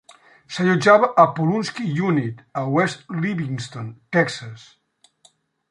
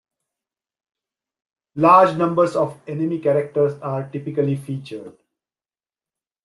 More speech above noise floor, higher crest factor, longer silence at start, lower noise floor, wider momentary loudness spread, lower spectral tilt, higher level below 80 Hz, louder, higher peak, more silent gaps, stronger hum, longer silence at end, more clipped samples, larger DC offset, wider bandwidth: second, 39 dB vs over 71 dB; about the same, 20 dB vs 20 dB; second, 0.5 s vs 1.75 s; second, -59 dBFS vs under -90 dBFS; about the same, 17 LU vs 17 LU; second, -6.5 dB/octave vs -8 dB/octave; about the same, -64 dBFS vs -68 dBFS; about the same, -20 LUFS vs -19 LUFS; about the same, -2 dBFS vs -2 dBFS; neither; neither; second, 1.15 s vs 1.35 s; neither; neither; about the same, 11 kHz vs 12 kHz